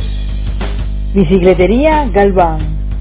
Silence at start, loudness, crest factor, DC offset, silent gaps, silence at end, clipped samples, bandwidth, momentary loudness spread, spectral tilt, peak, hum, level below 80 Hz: 0 s; -12 LUFS; 12 dB; under 0.1%; none; 0 s; 0.3%; 4 kHz; 11 LU; -11.5 dB/octave; 0 dBFS; 50 Hz at -20 dBFS; -18 dBFS